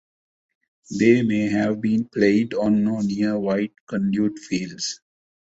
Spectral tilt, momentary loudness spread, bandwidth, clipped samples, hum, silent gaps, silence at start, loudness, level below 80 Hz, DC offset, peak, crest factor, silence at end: -6 dB/octave; 10 LU; 8 kHz; under 0.1%; none; 3.80-3.87 s; 0.9 s; -22 LUFS; -58 dBFS; under 0.1%; -4 dBFS; 18 dB; 0.45 s